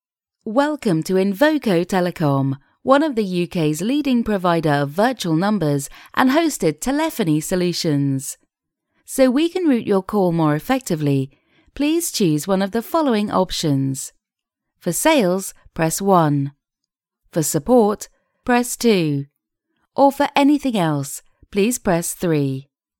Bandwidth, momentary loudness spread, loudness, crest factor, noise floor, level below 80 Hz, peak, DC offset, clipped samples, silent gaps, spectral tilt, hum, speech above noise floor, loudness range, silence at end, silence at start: 18 kHz; 11 LU; -19 LUFS; 18 dB; -83 dBFS; -48 dBFS; 0 dBFS; under 0.1%; under 0.1%; none; -5.5 dB/octave; none; 65 dB; 2 LU; 0.4 s; 0.45 s